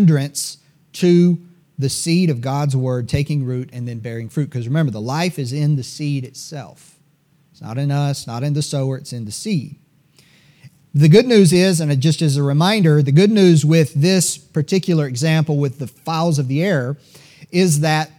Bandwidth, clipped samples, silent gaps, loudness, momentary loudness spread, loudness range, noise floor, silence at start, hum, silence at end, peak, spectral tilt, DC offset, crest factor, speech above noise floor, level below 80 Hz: 15.5 kHz; under 0.1%; none; -17 LUFS; 15 LU; 10 LU; -58 dBFS; 0 s; none; 0.15 s; 0 dBFS; -6 dB/octave; under 0.1%; 16 dB; 41 dB; -54 dBFS